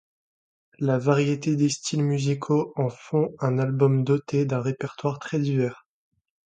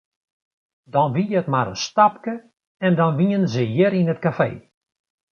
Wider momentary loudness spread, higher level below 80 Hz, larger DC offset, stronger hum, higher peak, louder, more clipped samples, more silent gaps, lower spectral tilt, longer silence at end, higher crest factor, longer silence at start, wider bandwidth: about the same, 7 LU vs 8 LU; second, -66 dBFS vs -60 dBFS; neither; neither; second, -6 dBFS vs -2 dBFS; second, -25 LUFS vs -20 LUFS; neither; second, none vs 2.67-2.75 s; about the same, -6.5 dB/octave vs -6.5 dB/octave; about the same, 0.7 s vs 0.75 s; about the same, 20 dB vs 20 dB; second, 0.8 s vs 0.95 s; first, 9.2 kHz vs 7 kHz